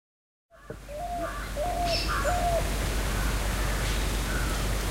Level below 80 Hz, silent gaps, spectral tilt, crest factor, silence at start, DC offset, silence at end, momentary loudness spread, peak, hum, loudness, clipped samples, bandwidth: -32 dBFS; none; -4 dB/octave; 14 dB; 0.55 s; under 0.1%; 0 s; 9 LU; -16 dBFS; none; -29 LUFS; under 0.1%; 16 kHz